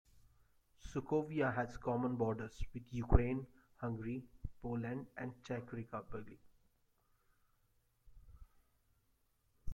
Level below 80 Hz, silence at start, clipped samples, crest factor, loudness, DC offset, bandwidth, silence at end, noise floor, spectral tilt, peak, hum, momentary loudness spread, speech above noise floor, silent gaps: -48 dBFS; 0.15 s; under 0.1%; 30 dB; -41 LUFS; under 0.1%; 9.2 kHz; 0 s; -77 dBFS; -8 dB/octave; -12 dBFS; none; 16 LU; 39 dB; none